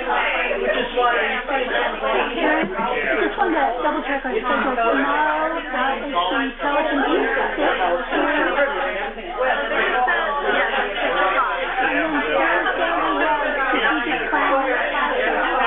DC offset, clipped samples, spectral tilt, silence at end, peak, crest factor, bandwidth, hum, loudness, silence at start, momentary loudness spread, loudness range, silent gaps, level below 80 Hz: under 0.1%; under 0.1%; -7 dB/octave; 0 s; -6 dBFS; 14 dB; 4.2 kHz; none; -20 LUFS; 0 s; 3 LU; 1 LU; none; -42 dBFS